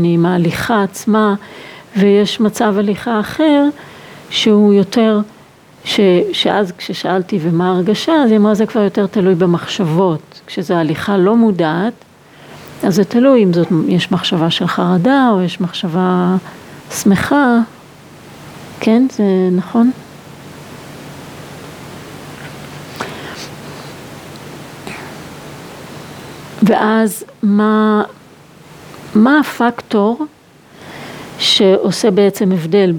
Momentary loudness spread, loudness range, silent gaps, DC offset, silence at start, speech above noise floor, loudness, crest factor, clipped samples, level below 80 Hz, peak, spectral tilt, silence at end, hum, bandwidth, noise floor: 21 LU; 16 LU; none; under 0.1%; 0 s; 30 dB; -13 LUFS; 14 dB; under 0.1%; -54 dBFS; 0 dBFS; -6 dB/octave; 0 s; none; 19.5 kHz; -42 dBFS